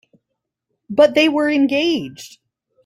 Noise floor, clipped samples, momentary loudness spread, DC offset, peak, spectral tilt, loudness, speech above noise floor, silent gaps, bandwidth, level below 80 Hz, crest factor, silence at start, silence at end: -78 dBFS; under 0.1%; 15 LU; under 0.1%; -2 dBFS; -4.5 dB/octave; -16 LUFS; 62 dB; none; 14.5 kHz; -62 dBFS; 16 dB; 0.9 s; 0.6 s